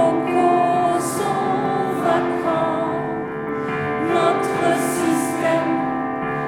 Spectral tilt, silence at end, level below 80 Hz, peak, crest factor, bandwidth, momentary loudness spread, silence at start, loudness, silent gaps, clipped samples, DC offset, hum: -5.5 dB/octave; 0 s; -56 dBFS; -6 dBFS; 14 dB; 18.5 kHz; 6 LU; 0 s; -20 LUFS; none; under 0.1%; under 0.1%; none